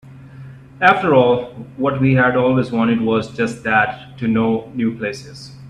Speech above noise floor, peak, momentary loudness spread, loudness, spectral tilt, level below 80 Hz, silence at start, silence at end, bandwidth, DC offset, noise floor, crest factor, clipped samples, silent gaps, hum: 21 dB; 0 dBFS; 11 LU; -17 LUFS; -7 dB/octave; -50 dBFS; 0.05 s; 0 s; 10.5 kHz; under 0.1%; -37 dBFS; 18 dB; under 0.1%; none; none